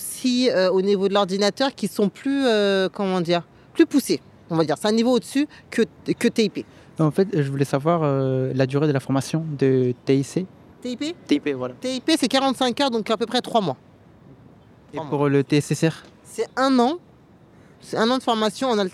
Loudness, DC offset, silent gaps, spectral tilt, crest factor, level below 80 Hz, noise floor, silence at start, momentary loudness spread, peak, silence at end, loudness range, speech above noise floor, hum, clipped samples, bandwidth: -22 LUFS; under 0.1%; none; -5.5 dB/octave; 18 dB; -64 dBFS; -51 dBFS; 0 s; 10 LU; -4 dBFS; 0 s; 3 LU; 30 dB; none; under 0.1%; 14.5 kHz